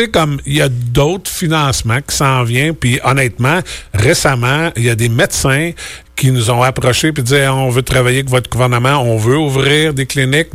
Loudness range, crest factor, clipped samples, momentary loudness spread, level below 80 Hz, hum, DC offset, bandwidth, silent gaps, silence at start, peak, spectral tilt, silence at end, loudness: 1 LU; 12 dB; under 0.1%; 4 LU; -32 dBFS; none; under 0.1%; 16 kHz; none; 0 s; -2 dBFS; -4.5 dB/octave; 0.05 s; -13 LUFS